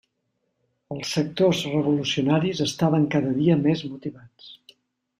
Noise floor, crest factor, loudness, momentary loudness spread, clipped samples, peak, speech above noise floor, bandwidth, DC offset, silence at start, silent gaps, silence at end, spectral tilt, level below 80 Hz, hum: -75 dBFS; 18 dB; -23 LUFS; 13 LU; under 0.1%; -8 dBFS; 52 dB; 14.5 kHz; under 0.1%; 0.9 s; none; 0.65 s; -6 dB/octave; -62 dBFS; none